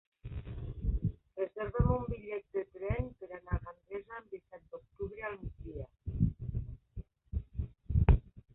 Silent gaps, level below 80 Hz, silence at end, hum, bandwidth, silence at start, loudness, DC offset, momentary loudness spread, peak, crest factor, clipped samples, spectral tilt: none; -40 dBFS; 0.15 s; none; 3.9 kHz; 0.25 s; -37 LUFS; under 0.1%; 17 LU; -10 dBFS; 26 dB; under 0.1%; -12 dB/octave